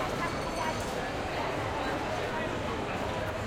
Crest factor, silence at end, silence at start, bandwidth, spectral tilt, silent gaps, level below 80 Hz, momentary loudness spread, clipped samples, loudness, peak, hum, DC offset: 12 dB; 0 s; 0 s; 16.5 kHz; -5 dB/octave; none; -48 dBFS; 1 LU; under 0.1%; -33 LUFS; -20 dBFS; none; under 0.1%